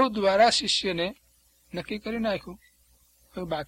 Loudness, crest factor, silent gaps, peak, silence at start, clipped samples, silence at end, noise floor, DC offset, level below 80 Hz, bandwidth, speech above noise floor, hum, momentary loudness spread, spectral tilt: -25 LUFS; 20 dB; none; -8 dBFS; 0 s; under 0.1%; 0 s; -63 dBFS; under 0.1%; -56 dBFS; 16 kHz; 36 dB; 60 Hz at -55 dBFS; 19 LU; -3.5 dB/octave